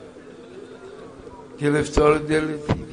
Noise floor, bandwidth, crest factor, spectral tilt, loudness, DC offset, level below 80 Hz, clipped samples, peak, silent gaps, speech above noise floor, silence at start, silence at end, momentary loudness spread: -42 dBFS; 10.5 kHz; 20 dB; -6 dB/octave; -21 LUFS; under 0.1%; -40 dBFS; under 0.1%; -4 dBFS; none; 22 dB; 0 s; 0 s; 23 LU